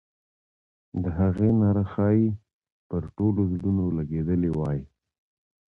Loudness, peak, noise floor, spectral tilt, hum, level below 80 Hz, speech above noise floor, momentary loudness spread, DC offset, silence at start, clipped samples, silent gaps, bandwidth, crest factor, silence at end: -25 LUFS; -12 dBFS; under -90 dBFS; -12 dB/octave; none; -42 dBFS; over 66 dB; 11 LU; under 0.1%; 0.95 s; under 0.1%; 2.53-2.62 s, 2.72-2.90 s; 3.7 kHz; 14 dB; 0.8 s